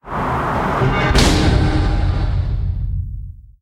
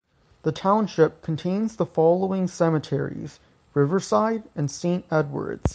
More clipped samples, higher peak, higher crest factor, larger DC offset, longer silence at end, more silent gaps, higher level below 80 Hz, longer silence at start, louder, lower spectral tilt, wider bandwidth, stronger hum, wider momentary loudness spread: neither; first, 0 dBFS vs -6 dBFS; about the same, 16 dB vs 18 dB; neither; first, 0.2 s vs 0 s; neither; first, -22 dBFS vs -46 dBFS; second, 0.05 s vs 0.45 s; first, -18 LUFS vs -24 LUFS; second, -5.5 dB/octave vs -7 dB/octave; first, 14 kHz vs 9.6 kHz; neither; first, 12 LU vs 9 LU